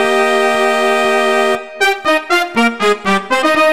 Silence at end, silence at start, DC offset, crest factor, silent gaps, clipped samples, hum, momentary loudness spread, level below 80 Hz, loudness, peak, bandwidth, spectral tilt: 0 s; 0 s; 1%; 12 dB; none; under 0.1%; none; 3 LU; -54 dBFS; -13 LUFS; 0 dBFS; 16.5 kHz; -3 dB/octave